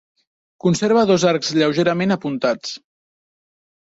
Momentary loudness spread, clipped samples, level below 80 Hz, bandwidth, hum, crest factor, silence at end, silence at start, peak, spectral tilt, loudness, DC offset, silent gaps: 10 LU; under 0.1%; -60 dBFS; 8 kHz; none; 16 dB; 1.2 s; 0.65 s; -4 dBFS; -5 dB/octave; -18 LUFS; under 0.1%; none